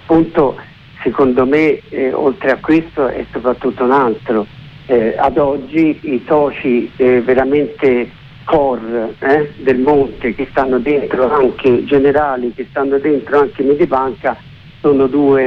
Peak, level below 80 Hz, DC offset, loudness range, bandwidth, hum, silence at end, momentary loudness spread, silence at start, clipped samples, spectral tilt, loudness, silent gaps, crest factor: -2 dBFS; -42 dBFS; under 0.1%; 2 LU; 5.6 kHz; none; 0 s; 8 LU; 0.05 s; under 0.1%; -8.5 dB/octave; -14 LUFS; none; 12 dB